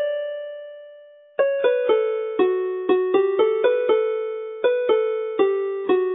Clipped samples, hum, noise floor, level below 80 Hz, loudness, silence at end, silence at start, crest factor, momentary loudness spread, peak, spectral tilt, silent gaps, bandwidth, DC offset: under 0.1%; none; -46 dBFS; -78 dBFS; -21 LUFS; 0 s; 0 s; 16 dB; 11 LU; -6 dBFS; -8.5 dB/octave; none; 4 kHz; under 0.1%